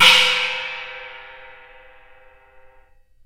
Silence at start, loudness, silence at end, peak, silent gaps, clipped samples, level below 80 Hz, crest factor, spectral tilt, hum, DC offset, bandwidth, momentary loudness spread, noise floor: 0 s; -16 LUFS; 1.85 s; 0 dBFS; none; under 0.1%; -56 dBFS; 22 dB; 0.5 dB/octave; none; under 0.1%; 16 kHz; 27 LU; -52 dBFS